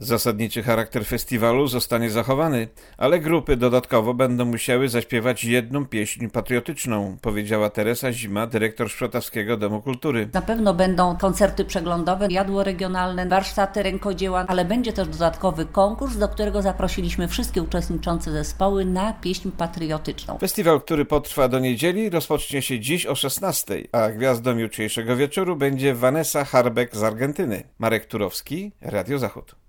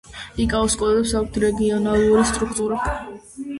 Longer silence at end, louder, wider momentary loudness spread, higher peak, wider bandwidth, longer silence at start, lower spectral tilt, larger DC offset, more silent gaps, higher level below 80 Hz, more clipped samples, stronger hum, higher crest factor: first, 0.15 s vs 0 s; about the same, -22 LUFS vs -20 LUFS; second, 7 LU vs 14 LU; about the same, -4 dBFS vs -4 dBFS; first, 20 kHz vs 11.5 kHz; about the same, 0 s vs 0.1 s; about the same, -5 dB/octave vs -4.5 dB/octave; neither; neither; about the same, -38 dBFS vs -36 dBFS; neither; neither; about the same, 18 dB vs 16 dB